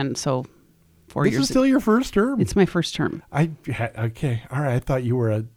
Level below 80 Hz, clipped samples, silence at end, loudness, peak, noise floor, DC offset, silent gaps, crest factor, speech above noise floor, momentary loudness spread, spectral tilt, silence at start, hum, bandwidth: -46 dBFS; under 0.1%; 0.1 s; -22 LUFS; -6 dBFS; -56 dBFS; under 0.1%; none; 18 dB; 35 dB; 8 LU; -6 dB/octave; 0 s; none; 19 kHz